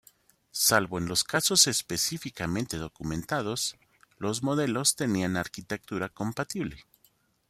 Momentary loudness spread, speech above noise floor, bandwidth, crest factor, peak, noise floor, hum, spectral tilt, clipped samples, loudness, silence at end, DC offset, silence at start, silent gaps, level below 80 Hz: 12 LU; 38 dB; 16 kHz; 24 dB; -6 dBFS; -67 dBFS; none; -2.5 dB/octave; under 0.1%; -27 LUFS; 0.7 s; under 0.1%; 0.55 s; none; -58 dBFS